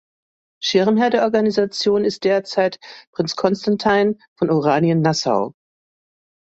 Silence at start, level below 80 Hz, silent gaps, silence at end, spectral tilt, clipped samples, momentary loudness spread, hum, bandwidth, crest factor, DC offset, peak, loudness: 0.6 s; -60 dBFS; 3.07-3.13 s, 4.28-4.36 s; 1 s; -5.5 dB/octave; under 0.1%; 8 LU; none; 8 kHz; 16 dB; under 0.1%; -2 dBFS; -18 LUFS